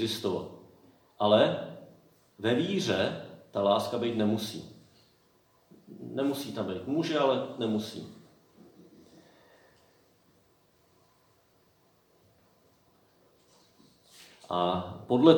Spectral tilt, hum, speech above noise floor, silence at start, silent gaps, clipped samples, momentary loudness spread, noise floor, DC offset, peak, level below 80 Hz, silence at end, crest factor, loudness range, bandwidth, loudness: -5.5 dB/octave; none; 38 dB; 0 s; none; under 0.1%; 21 LU; -66 dBFS; under 0.1%; -6 dBFS; -74 dBFS; 0 s; 26 dB; 9 LU; 20 kHz; -30 LUFS